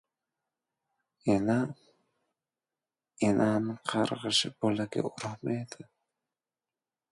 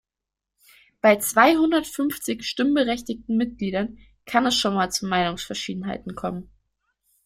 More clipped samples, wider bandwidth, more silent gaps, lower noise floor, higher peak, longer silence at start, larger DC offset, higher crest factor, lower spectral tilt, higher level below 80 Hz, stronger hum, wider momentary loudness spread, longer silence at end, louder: neither; second, 11.5 kHz vs 16.5 kHz; neither; about the same, under -90 dBFS vs -87 dBFS; second, -12 dBFS vs -2 dBFS; first, 1.25 s vs 1.05 s; neither; about the same, 20 dB vs 22 dB; about the same, -5 dB/octave vs -4 dB/octave; second, -68 dBFS vs -54 dBFS; neither; second, 10 LU vs 14 LU; first, 1.3 s vs 0.85 s; second, -30 LUFS vs -23 LUFS